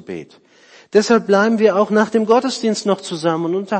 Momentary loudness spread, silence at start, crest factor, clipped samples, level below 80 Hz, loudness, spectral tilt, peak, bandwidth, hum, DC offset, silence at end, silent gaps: 7 LU; 0.1 s; 16 dB; under 0.1%; -64 dBFS; -16 LUFS; -5 dB/octave; -2 dBFS; 8.8 kHz; none; under 0.1%; 0 s; none